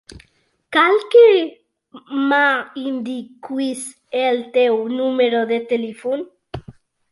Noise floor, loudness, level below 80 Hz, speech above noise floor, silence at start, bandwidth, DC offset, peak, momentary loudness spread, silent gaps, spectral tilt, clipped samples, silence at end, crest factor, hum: -61 dBFS; -18 LUFS; -56 dBFS; 44 dB; 0.15 s; 11.5 kHz; under 0.1%; -2 dBFS; 17 LU; none; -4 dB/octave; under 0.1%; 0.4 s; 16 dB; none